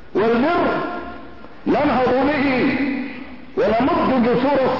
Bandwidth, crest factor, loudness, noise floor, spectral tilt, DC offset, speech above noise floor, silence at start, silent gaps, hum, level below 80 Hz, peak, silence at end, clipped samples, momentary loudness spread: 6 kHz; 10 dB; -19 LUFS; -39 dBFS; -8 dB/octave; 1%; 22 dB; 0.15 s; none; none; -46 dBFS; -8 dBFS; 0 s; under 0.1%; 13 LU